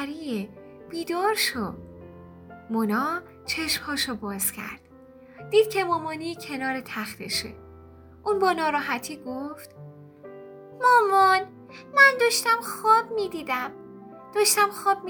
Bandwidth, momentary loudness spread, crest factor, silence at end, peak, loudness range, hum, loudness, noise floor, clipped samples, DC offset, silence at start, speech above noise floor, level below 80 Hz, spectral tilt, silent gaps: over 20 kHz; 23 LU; 22 dB; 0 s; -4 dBFS; 8 LU; none; -24 LUFS; -49 dBFS; under 0.1%; under 0.1%; 0 s; 25 dB; -62 dBFS; -2.5 dB/octave; none